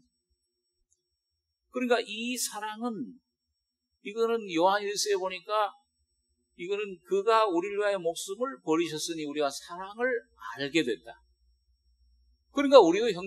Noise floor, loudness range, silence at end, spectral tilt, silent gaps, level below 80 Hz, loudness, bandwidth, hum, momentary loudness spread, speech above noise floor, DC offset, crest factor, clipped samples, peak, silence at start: -83 dBFS; 5 LU; 0 s; -3 dB/octave; none; -72 dBFS; -28 LUFS; 13 kHz; none; 14 LU; 55 dB; under 0.1%; 28 dB; under 0.1%; -2 dBFS; 1.75 s